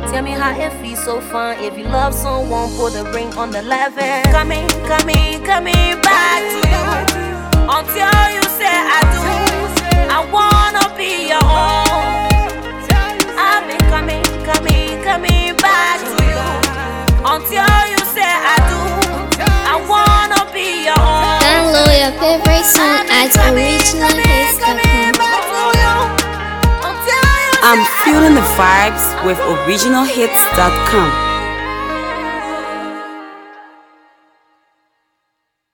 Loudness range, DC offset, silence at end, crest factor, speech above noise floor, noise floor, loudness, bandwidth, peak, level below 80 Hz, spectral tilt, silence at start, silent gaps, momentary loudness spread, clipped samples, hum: 8 LU; under 0.1%; 2.1 s; 14 dB; 59 dB; -71 dBFS; -13 LUFS; 19.5 kHz; 0 dBFS; -20 dBFS; -3.5 dB/octave; 0 s; none; 10 LU; under 0.1%; none